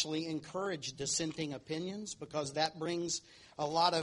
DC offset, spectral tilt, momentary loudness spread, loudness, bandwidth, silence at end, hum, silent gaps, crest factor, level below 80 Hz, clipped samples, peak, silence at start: under 0.1%; -3 dB/octave; 7 LU; -37 LUFS; 11.5 kHz; 0 s; none; none; 22 dB; -70 dBFS; under 0.1%; -14 dBFS; 0 s